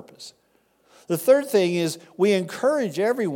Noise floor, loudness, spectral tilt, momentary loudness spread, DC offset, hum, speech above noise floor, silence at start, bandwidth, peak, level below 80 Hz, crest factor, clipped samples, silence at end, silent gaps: -64 dBFS; -22 LUFS; -5 dB/octave; 18 LU; under 0.1%; none; 42 dB; 0.2 s; 18 kHz; -6 dBFS; -78 dBFS; 18 dB; under 0.1%; 0 s; none